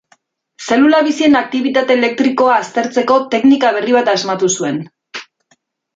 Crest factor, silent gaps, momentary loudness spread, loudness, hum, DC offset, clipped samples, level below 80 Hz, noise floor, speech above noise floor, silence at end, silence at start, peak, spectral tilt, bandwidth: 12 dB; none; 15 LU; -13 LUFS; none; under 0.1%; under 0.1%; -60 dBFS; -59 dBFS; 46 dB; 0.75 s; 0.6 s; -2 dBFS; -3.5 dB/octave; 7.8 kHz